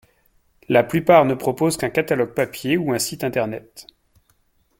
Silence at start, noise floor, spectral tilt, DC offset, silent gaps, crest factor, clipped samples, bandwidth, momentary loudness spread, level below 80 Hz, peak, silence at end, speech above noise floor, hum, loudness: 0.7 s; -63 dBFS; -5 dB/octave; under 0.1%; none; 20 dB; under 0.1%; 17 kHz; 9 LU; -56 dBFS; 0 dBFS; 0.95 s; 43 dB; none; -20 LUFS